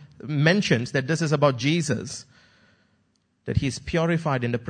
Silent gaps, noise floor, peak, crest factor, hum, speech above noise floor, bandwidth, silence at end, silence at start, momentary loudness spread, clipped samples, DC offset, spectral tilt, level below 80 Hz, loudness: none; -68 dBFS; -4 dBFS; 20 dB; none; 45 dB; 9.6 kHz; 0 s; 0 s; 9 LU; under 0.1%; under 0.1%; -5.5 dB/octave; -46 dBFS; -23 LUFS